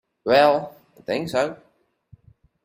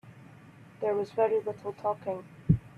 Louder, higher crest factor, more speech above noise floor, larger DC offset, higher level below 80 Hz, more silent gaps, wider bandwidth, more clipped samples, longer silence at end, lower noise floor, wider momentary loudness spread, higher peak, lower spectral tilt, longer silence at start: first, -21 LUFS vs -31 LUFS; about the same, 20 dB vs 22 dB; first, 36 dB vs 23 dB; neither; second, -62 dBFS vs -52 dBFS; neither; first, 16 kHz vs 9.8 kHz; neither; first, 1.1 s vs 0.1 s; first, -56 dBFS vs -52 dBFS; first, 18 LU vs 10 LU; first, -4 dBFS vs -10 dBFS; second, -5 dB/octave vs -9.5 dB/octave; first, 0.25 s vs 0.05 s